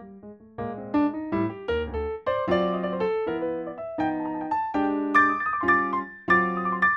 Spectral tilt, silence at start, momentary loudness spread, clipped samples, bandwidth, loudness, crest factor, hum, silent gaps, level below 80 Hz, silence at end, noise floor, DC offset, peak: -7.5 dB/octave; 0 s; 10 LU; under 0.1%; 7.6 kHz; -25 LUFS; 18 dB; none; none; -48 dBFS; 0 s; -45 dBFS; under 0.1%; -6 dBFS